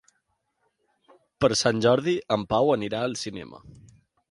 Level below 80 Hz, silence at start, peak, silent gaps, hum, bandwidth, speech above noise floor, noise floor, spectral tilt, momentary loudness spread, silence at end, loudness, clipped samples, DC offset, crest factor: -58 dBFS; 1.4 s; -6 dBFS; none; none; 11.5 kHz; 50 dB; -75 dBFS; -4.5 dB/octave; 13 LU; 0.6 s; -24 LUFS; under 0.1%; under 0.1%; 20 dB